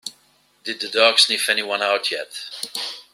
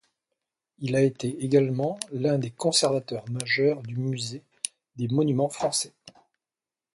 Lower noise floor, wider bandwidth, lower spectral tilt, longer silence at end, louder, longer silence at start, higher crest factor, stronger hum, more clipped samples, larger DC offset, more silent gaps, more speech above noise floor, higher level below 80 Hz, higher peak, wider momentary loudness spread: second, -59 dBFS vs under -90 dBFS; first, 16 kHz vs 11.5 kHz; second, 0.5 dB/octave vs -4.5 dB/octave; second, 0.1 s vs 0.85 s; first, -19 LUFS vs -26 LUFS; second, 0.05 s vs 0.8 s; about the same, 22 dB vs 22 dB; neither; neither; neither; neither; second, 38 dB vs over 65 dB; second, -74 dBFS vs -66 dBFS; first, -2 dBFS vs -6 dBFS; first, 17 LU vs 12 LU